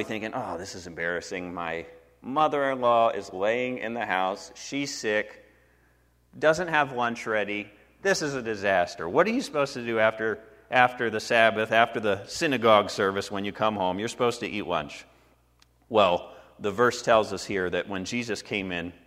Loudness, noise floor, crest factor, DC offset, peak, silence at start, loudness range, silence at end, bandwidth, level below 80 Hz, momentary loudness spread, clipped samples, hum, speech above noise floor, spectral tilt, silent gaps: -26 LUFS; -63 dBFS; 24 dB; under 0.1%; -4 dBFS; 0 s; 5 LU; 0.15 s; 15.5 kHz; -62 dBFS; 12 LU; under 0.1%; none; 37 dB; -4 dB/octave; none